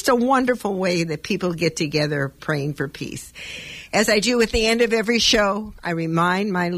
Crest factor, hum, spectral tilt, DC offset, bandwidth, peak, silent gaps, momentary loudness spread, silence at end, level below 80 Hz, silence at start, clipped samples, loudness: 16 dB; none; -4 dB/octave; under 0.1%; 15.5 kHz; -4 dBFS; none; 14 LU; 0 s; -42 dBFS; 0 s; under 0.1%; -20 LUFS